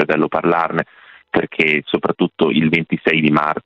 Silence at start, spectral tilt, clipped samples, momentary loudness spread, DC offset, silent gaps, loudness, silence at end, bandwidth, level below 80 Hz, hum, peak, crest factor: 0 s; -7.5 dB/octave; under 0.1%; 7 LU; under 0.1%; none; -17 LUFS; 0.05 s; 7.4 kHz; -54 dBFS; none; 0 dBFS; 16 dB